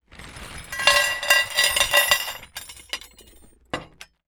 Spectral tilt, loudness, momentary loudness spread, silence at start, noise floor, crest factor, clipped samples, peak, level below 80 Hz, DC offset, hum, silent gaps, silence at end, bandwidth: 0.5 dB/octave; -18 LUFS; 21 LU; 0.2 s; -52 dBFS; 22 dB; under 0.1%; -2 dBFS; -50 dBFS; under 0.1%; none; none; 0.4 s; over 20 kHz